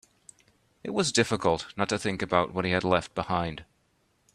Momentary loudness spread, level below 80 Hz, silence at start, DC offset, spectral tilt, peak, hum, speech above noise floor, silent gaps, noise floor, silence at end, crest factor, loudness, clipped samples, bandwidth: 9 LU; -58 dBFS; 0.85 s; under 0.1%; -4 dB/octave; -6 dBFS; none; 42 dB; none; -70 dBFS; 0.7 s; 24 dB; -27 LUFS; under 0.1%; 13 kHz